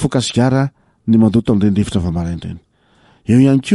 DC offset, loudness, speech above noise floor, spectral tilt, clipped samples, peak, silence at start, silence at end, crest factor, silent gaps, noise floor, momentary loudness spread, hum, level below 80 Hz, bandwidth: under 0.1%; -15 LUFS; 39 dB; -7 dB/octave; under 0.1%; -2 dBFS; 0 s; 0 s; 14 dB; none; -52 dBFS; 15 LU; none; -38 dBFS; 11.5 kHz